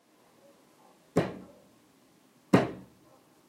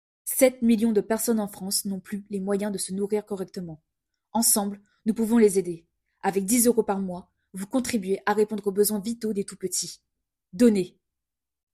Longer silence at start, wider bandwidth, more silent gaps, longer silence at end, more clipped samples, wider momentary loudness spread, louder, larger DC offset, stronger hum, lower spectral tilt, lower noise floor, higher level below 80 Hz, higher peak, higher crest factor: first, 1.15 s vs 0.25 s; about the same, 16 kHz vs 15.5 kHz; neither; second, 0.65 s vs 0.85 s; neither; first, 21 LU vs 14 LU; second, -30 LUFS vs -25 LUFS; neither; neither; first, -7 dB/octave vs -4 dB/octave; second, -63 dBFS vs -88 dBFS; about the same, -66 dBFS vs -62 dBFS; about the same, -8 dBFS vs -6 dBFS; first, 28 dB vs 20 dB